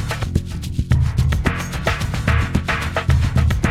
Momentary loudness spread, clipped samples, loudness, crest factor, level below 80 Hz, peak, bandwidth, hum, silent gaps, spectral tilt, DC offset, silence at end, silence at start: 5 LU; under 0.1%; -20 LUFS; 16 dB; -24 dBFS; -2 dBFS; 15 kHz; none; none; -6 dB/octave; under 0.1%; 0 s; 0 s